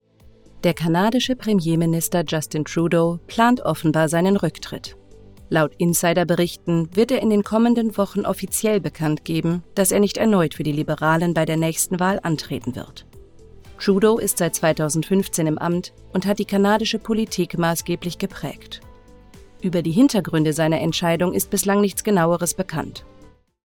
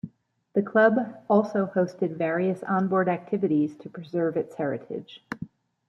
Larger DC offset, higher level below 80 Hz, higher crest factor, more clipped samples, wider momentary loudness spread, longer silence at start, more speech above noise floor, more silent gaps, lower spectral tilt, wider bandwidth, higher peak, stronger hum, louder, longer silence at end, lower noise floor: neither; first, -48 dBFS vs -70 dBFS; about the same, 18 dB vs 20 dB; neither; second, 10 LU vs 17 LU; first, 0.55 s vs 0.05 s; about the same, 30 dB vs 30 dB; neither; second, -5 dB/octave vs -8.5 dB/octave; first, 19.5 kHz vs 7.2 kHz; first, -2 dBFS vs -6 dBFS; neither; first, -20 LUFS vs -25 LUFS; first, 0.65 s vs 0.4 s; second, -50 dBFS vs -55 dBFS